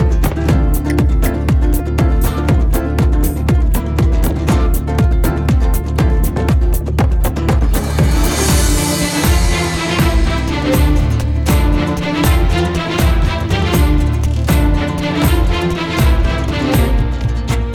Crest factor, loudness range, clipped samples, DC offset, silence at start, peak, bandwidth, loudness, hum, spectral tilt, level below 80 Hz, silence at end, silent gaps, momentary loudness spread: 12 dB; 1 LU; under 0.1%; under 0.1%; 0 s; 0 dBFS; 20 kHz; -15 LUFS; none; -5.5 dB/octave; -16 dBFS; 0 s; none; 3 LU